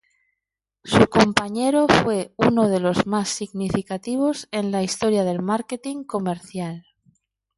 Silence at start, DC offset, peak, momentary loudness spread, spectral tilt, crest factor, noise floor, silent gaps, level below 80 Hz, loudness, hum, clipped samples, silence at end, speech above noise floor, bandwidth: 0.85 s; under 0.1%; 0 dBFS; 12 LU; -5 dB/octave; 22 dB; -85 dBFS; none; -50 dBFS; -21 LUFS; none; under 0.1%; 0.75 s; 64 dB; 11.5 kHz